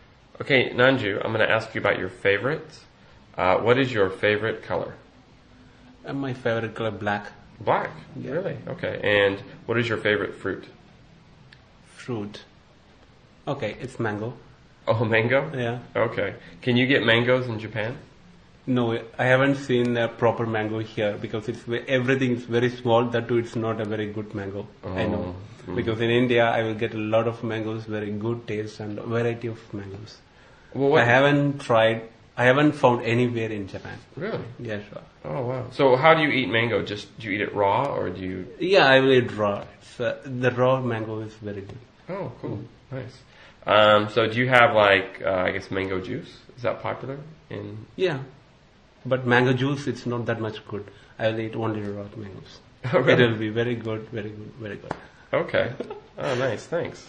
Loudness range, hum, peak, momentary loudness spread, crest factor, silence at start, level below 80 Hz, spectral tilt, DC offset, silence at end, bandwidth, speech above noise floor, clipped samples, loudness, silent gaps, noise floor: 8 LU; none; 0 dBFS; 18 LU; 24 dB; 0.4 s; -58 dBFS; -6.5 dB/octave; under 0.1%; 0.05 s; 9.8 kHz; 31 dB; under 0.1%; -24 LUFS; none; -55 dBFS